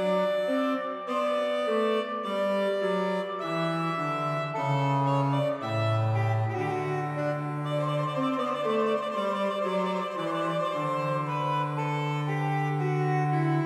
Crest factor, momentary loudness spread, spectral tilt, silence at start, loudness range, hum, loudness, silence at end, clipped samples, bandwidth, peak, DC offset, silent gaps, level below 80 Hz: 14 dB; 4 LU; -7.5 dB/octave; 0 s; 1 LU; none; -28 LUFS; 0 s; under 0.1%; 13 kHz; -14 dBFS; under 0.1%; none; -76 dBFS